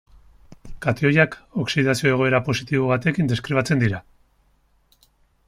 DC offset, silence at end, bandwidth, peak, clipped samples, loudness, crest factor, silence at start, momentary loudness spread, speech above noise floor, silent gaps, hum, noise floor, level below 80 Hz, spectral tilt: under 0.1%; 1.45 s; 15 kHz; -4 dBFS; under 0.1%; -21 LUFS; 20 dB; 0.5 s; 7 LU; 41 dB; none; none; -62 dBFS; -50 dBFS; -6 dB/octave